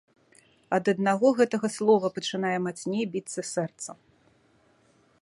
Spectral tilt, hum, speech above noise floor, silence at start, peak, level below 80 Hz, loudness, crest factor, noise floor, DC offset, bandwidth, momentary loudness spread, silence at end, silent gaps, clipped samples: -5 dB/octave; none; 38 dB; 0.7 s; -8 dBFS; -74 dBFS; -26 LUFS; 20 dB; -64 dBFS; under 0.1%; 11.5 kHz; 10 LU; 1.25 s; none; under 0.1%